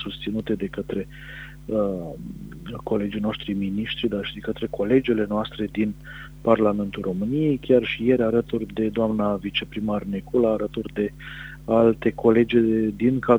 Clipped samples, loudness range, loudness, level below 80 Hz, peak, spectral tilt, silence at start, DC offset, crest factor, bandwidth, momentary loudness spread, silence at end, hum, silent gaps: under 0.1%; 6 LU; -23 LUFS; -46 dBFS; -2 dBFS; -8 dB/octave; 0 s; under 0.1%; 20 dB; 15.5 kHz; 16 LU; 0 s; none; none